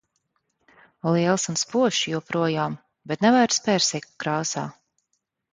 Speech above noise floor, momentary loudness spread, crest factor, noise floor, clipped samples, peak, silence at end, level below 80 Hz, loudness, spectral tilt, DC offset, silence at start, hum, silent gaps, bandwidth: 53 dB; 11 LU; 18 dB; -76 dBFS; under 0.1%; -6 dBFS; 0.8 s; -68 dBFS; -23 LUFS; -4 dB/octave; under 0.1%; 1.05 s; none; none; 9.6 kHz